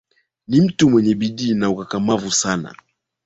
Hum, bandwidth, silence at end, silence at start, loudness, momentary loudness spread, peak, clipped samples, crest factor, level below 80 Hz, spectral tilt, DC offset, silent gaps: none; 8.4 kHz; 0.55 s; 0.5 s; -18 LUFS; 8 LU; -2 dBFS; under 0.1%; 16 dB; -52 dBFS; -5 dB/octave; under 0.1%; none